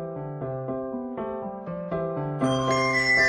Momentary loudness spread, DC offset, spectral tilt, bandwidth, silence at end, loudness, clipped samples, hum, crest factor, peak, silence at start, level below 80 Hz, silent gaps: 12 LU; under 0.1%; -5 dB/octave; 12 kHz; 0 s; -27 LUFS; under 0.1%; none; 16 dB; -10 dBFS; 0 s; -54 dBFS; none